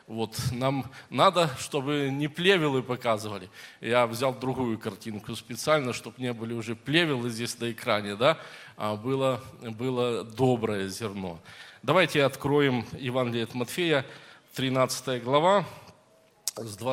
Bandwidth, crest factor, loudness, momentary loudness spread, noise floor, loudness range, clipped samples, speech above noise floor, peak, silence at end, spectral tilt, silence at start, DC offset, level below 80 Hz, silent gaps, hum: 16.5 kHz; 22 dB; -28 LUFS; 14 LU; -61 dBFS; 3 LU; under 0.1%; 33 dB; -6 dBFS; 0 s; -5 dB/octave; 0.1 s; under 0.1%; -66 dBFS; none; none